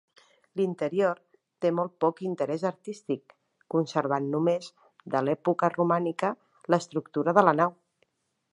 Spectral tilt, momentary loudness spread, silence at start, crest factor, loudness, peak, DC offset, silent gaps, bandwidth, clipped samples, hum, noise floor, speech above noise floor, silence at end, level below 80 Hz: -7 dB/octave; 10 LU; 0.55 s; 24 dB; -28 LUFS; -4 dBFS; under 0.1%; none; 11 kHz; under 0.1%; none; -73 dBFS; 46 dB; 0.8 s; -78 dBFS